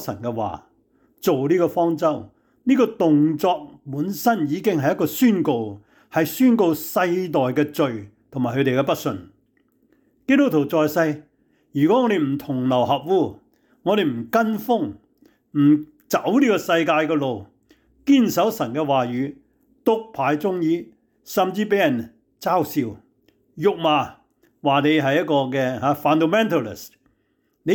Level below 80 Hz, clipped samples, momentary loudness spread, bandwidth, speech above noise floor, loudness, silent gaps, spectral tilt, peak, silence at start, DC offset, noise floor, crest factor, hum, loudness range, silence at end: -64 dBFS; under 0.1%; 11 LU; 19.5 kHz; 48 dB; -21 LUFS; none; -6 dB/octave; -8 dBFS; 0 s; under 0.1%; -68 dBFS; 14 dB; none; 3 LU; 0 s